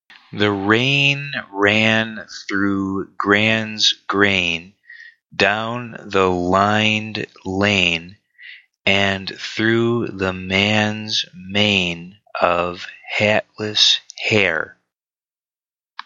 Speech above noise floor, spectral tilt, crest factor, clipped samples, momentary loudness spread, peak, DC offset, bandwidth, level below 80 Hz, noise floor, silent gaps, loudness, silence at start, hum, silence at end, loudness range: over 71 dB; -4 dB/octave; 20 dB; under 0.1%; 11 LU; 0 dBFS; under 0.1%; 8 kHz; -56 dBFS; under -90 dBFS; none; -18 LUFS; 0.1 s; none; 1.35 s; 2 LU